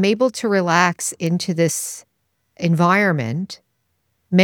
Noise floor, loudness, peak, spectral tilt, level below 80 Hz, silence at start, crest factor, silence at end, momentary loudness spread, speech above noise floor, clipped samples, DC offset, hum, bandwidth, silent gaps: -70 dBFS; -19 LUFS; 0 dBFS; -5 dB/octave; -68 dBFS; 0 s; 18 dB; 0 s; 13 LU; 51 dB; under 0.1%; under 0.1%; none; 18 kHz; none